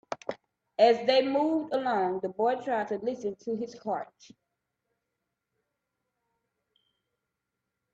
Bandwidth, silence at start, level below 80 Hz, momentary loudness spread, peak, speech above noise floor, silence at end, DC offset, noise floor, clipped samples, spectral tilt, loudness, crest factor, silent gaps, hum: 8 kHz; 0.1 s; -78 dBFS; 15 LU; -10 dBFS; 57 dB; 3.9 s; under 0.1%; -85 dBFS; under 0.1%; -5 dB/octave; -28 LUFS; 22 dB; none; none